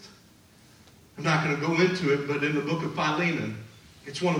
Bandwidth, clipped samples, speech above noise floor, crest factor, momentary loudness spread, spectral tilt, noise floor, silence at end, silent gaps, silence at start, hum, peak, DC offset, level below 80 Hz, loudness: 12.5 kHz; under 0.1%; 30 dB; 18 dB; 13 LU; -5.5 dB/octave; -56 dBFS; 0 s; none; 0 s; none; -10 dBFS; under 0.1%; -66 dBFS; -26 LUFS